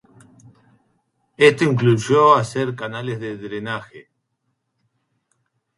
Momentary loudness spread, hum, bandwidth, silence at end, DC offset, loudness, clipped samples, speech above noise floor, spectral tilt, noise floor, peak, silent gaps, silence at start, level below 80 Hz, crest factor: 15 LU; none; 11.5 kHz; 1.75 s; under 0.1%; -18 LUFS; under 0.1%; 55 dB; -6 dB/octave; -73 dBFS; 0 dBFS; none; 1.4 s; -62 dBFS; 20 dB